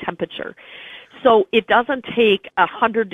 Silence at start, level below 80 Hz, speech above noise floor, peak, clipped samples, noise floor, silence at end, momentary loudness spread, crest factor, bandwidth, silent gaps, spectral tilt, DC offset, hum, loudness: 0 s; -58 dBFS; 21 dB; 0 dBFS; under 0.1%; -39 dBFS; 0.05 s; 20 LU; 18 dB; 3.9 kHz; none; -6.5 dB/octave; under 0.1%; none; -18 LUFS